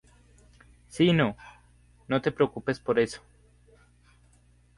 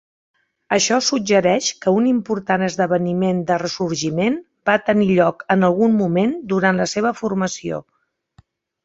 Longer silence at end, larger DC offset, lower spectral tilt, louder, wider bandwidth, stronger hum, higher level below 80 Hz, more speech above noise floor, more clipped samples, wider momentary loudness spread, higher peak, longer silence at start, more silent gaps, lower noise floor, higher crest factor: first, 1.6 s vs 1.05 s; neither; first, -6.5 dB/octave vs -4.5 dB/octave; second, -27 LUFS vs -18 LUFS; first, 11.5 kHz vs 8 kHz; first, 60 Hz at -55 dBFS vs none; about the same, -58 dBFS vs -58 dBFS; about the same, 35 dB vs 38 dB; neither; first, 20 LU vs 6 LU; second, -10 dBFS vs -2 dBFS; first, 0.95 s vs 0.7 s; neither; first, -60 dBFS vs -55 dBFS; about the same, 20 dB vs 18 dB